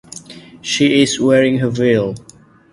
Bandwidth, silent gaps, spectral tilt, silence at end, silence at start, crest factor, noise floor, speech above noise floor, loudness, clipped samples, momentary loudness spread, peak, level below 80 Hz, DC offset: 11.5 kHz; none; -5 dB/octave; 0.55 s; 0.15 s; 16 dB; -37 dBFS; 23 dB; -14 LUFS; under 0.1%; 20 LU; 0 dBFS; -52 dBFS; under 0.1%